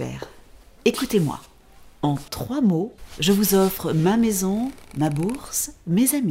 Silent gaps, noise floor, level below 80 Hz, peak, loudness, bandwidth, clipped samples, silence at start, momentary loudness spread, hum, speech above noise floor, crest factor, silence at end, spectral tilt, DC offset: none; -48 dBFS; -48 dBFS; -6 dBFS; -22 LUFS; 16.5 kHz; under 0.1%; 0 s; 10 LU; none; 26 dB; 18 dB; 0 s; -5 dB/octave; under 0.1%